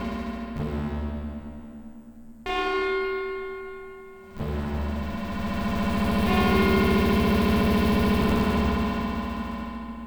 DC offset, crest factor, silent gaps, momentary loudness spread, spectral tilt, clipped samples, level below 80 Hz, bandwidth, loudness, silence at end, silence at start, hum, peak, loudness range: under 0.1%; 16 dB; none; 18 LU; -6.5 dB/octave; under 0.1%; -34 dBFS; over 20 kHz; -25 LUFS; 0 s; 0 s; none; -8 dBFS; 9 LU